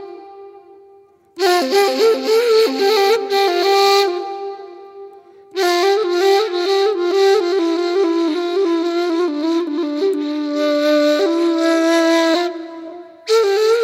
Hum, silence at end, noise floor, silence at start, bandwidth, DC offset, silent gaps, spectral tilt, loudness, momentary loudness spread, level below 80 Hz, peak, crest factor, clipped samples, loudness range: none; 0 s; -48 dBFS; 0 s; 16 kHz; under 0.1%; none; -1.5 dB/octave; -16 LUFS; 14 LU; -78 dBFS; 0 dBFS; 16 dB; under 0.1%; 3 LU